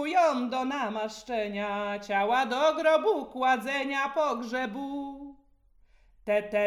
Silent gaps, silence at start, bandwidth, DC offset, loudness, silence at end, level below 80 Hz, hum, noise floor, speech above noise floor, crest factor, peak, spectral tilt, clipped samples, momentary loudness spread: none; 0 s; 13.5 kHz; under 0.1%; -28 LUFS; 0 s; -64 dBFS; none; -62 dBFS; 34 dB; 16 dB; -12 dBFS; -4 dB/octave; under 0.1%; 11 LU